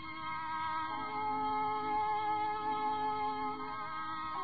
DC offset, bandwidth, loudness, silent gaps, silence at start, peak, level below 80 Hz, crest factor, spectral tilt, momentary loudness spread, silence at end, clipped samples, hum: 0.3%; 5 kHz; -36 LUFS; none; 0 s; -26 dBFS; -66 dBFS; 10 dB; -7 dB/octave; 6 LU; 0 s; under 0.1%; 50 Hz at -60 dBFS